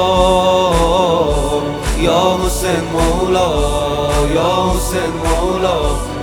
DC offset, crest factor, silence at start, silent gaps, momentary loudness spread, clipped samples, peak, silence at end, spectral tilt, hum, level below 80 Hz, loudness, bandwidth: under 0.1%; 14 dB; 0 s; none; 5 LU; under 0.1%; 0 dBFS; 0 s; -5 dB/octave; none; -22 dBFS; -15 LUFS; 17.5 kHz